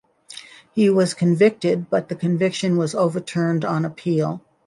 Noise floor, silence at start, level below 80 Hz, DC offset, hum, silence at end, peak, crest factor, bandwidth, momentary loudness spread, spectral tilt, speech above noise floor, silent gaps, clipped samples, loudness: -42 dBFS; 0.3 s; -64 dBFS; under 0.1%; none; 0.25 s; -4 dBFS; 16 dB; 11.5 kHz; 11 LU; -6.5 dB/octave; 23 dB; none; under 0.1%; -20 LUFS